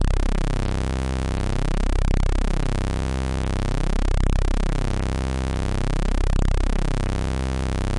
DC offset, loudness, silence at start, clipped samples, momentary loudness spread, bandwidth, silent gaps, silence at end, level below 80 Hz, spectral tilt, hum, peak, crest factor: under 0.1%; -25 LUFS; 0 s; under 0.1%; 2 LU; 11 kHz; none; 0 s; -22 dBFS; -6 dB/octave; none; -12 dBFS; 8 dB